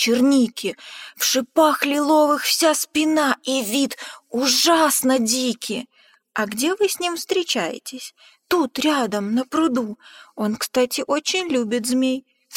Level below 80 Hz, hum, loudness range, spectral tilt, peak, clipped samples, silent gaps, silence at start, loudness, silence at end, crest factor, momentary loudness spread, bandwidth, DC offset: -66 dBFS; none; 5 LU; -2.5 dB/octave; -4 dBFS; under 0.1%; none; 0 s; -20 LUFS; 0 s; 16 dB; 13 LU; 17 kHz; under 0.1%